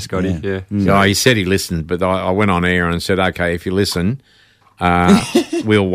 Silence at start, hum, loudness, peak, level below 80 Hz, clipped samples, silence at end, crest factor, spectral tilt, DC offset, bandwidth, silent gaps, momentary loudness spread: 0 s; none; -16 LUFS; -2 dBFS; -40 dBFS; under 0.1%; 0 s; 14 dB; -5 dB/octave; under 0.1%; 16 kHz; none; 8 LU